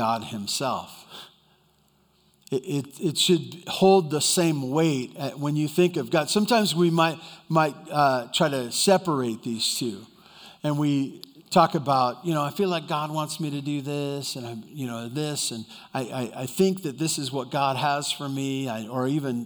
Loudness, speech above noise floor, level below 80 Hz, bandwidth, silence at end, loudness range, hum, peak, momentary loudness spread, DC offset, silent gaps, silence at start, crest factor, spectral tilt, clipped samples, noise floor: -25 LUFS; 39 dB; -72 dBFS; over 20 kHz; 0 s; 6 LU; none; -4 dBFS; 12 LU; under 0.1%; none; 0 s; 20 dB; -4.5 dB/octave; under 0.1%; -63 dBFS